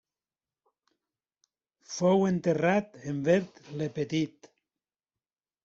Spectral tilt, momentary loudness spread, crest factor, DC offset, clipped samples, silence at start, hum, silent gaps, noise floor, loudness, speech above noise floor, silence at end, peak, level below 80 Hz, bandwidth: -6.5 dB/octave; 12 LU; 20 dB; under 0.1%; under 0.1%; 1.9 s; none; none; under -90 dBFS; -28 LUFS; over 62 dB; 1.35 s; -12 dBFS; -70 dBFS; 7.8 kHz